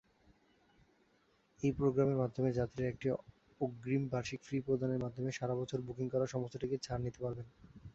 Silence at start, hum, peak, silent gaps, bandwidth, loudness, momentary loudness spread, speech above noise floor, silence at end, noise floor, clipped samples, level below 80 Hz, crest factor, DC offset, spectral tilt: 1.6 s; none; -20 dBFS; none; 8 kHz; -37 LUFS; 9 LU; 36 dB; 0.05 s; -73 dBFS; under 0.1%; -62 dBFS; 18 dB; under 0.1%; -7.5 dB/octave